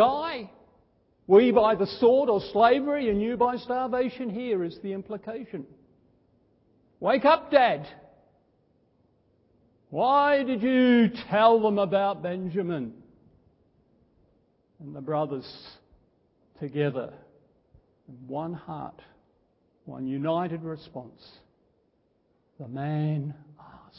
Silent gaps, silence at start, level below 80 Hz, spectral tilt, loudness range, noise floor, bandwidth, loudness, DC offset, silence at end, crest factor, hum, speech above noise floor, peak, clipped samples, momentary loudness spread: none; 0 s; -62 dBFS; -10.5 dB/octave; 13 LU; -69 dBFS; 5.8 kHz; -25 LUFS; under 0.1%; 0.65 s; 22 dB; none; 44 dB; -6 dBFS; under 0.1%; 20 LU